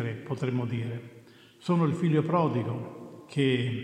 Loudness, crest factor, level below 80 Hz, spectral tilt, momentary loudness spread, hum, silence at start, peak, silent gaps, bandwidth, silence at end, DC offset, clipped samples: -29 LUFS; 18 dB; -74 dBFS; -8 dB/octave; 14 LU; none; 0 s; -12 dBFS; none; 10 kHz; 0 s; under 0.1%; under 0.1%